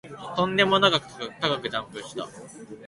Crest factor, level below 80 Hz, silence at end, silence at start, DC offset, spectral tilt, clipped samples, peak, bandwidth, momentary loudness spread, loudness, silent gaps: 20 dB; -60 dBFS; 0 s; 0.05 s; under 0.1%; -4 dB/octave; under 0.1%; -6 dBFS; 11.5 kHz; 19 LU; -23 LUFS; none